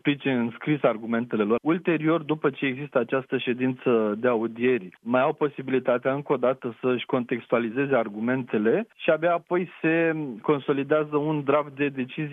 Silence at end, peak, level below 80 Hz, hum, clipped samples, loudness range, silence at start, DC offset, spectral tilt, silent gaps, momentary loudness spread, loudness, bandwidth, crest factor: 0 s; -6 dBFS; -74 dBFS; none; under 0.1%; 1 LU; 0.05 s; under 0.1%; -9.5 dB/octave; none; 4 LU; -25 LUFS; 3.9 kHz; 18 dB